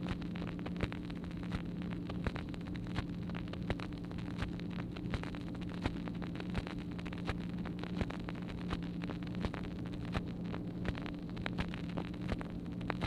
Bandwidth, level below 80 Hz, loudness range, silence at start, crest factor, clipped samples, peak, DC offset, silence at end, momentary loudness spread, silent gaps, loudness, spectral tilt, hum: 10.5 kHz; -50 dBFS; 0 LU; 0 s; 26 dB; under 0.1%; -14 dBFS; under 0.1%; 0 s; 3 LU; none; -41 LUFS; -7.5 dB/octave; none